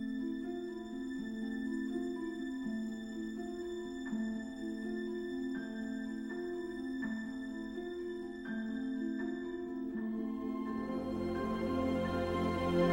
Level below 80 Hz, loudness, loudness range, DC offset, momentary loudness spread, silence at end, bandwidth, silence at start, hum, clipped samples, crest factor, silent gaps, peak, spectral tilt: -60 dBFS; -39 LUFS; 3 LU; under 0.1%; 7 LU; 0 s; 16 kHz; 0 s; none; under 0.1%; 18 dB; none; -20 dBFS; -7 dB/octave